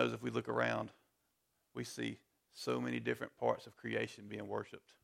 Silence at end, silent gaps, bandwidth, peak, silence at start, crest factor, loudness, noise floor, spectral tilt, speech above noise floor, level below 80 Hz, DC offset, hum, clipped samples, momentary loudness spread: 0.25 s; none; 16 kHz; -18 dBFS; 0 s; 22 dB; -40 LUFS; -82 dBFS; -5.5 dB/octave; 42 dB; -78 dBFS; under 0.1%; none; under 0.1%; 13 LU